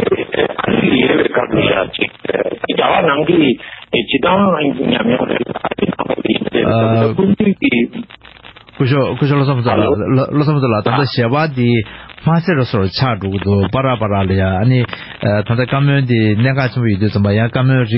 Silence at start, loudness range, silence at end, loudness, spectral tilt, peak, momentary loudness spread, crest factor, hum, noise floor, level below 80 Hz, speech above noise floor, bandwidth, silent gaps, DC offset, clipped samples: 0 s; 1 LU; 0 s; -14 LUFS; -11.5 dB/octave; 0 dBFS; 6 LU; 14 dB; none; -39 dBFS; -38 dBFS; 25 dB; 5.8 kHz; none; under 0.1%; under 0.1%